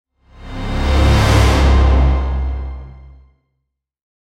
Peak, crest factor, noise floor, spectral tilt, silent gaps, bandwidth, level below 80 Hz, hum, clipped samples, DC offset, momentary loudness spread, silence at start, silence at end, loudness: -2 dBFS; 14 dB; -74 dBFS; -6 dB/octave; none; 12 kHz; -16 dBFS; none; under 0.1%; under 0.1%; 17 LU; 0.4 s; 1.35 s; -15 LUFS